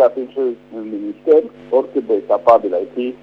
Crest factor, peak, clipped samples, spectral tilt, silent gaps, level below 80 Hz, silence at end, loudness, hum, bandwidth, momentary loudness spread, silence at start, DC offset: 16 dB; 0 dBFS; under 0.1%; -7.5 dB/octave; none; -62 dBFS; 0.05 s; -17 LUFS; 50 Hz at -55 dBFS; 5.8 kHz; 13 LU; 0 s; under 0.1%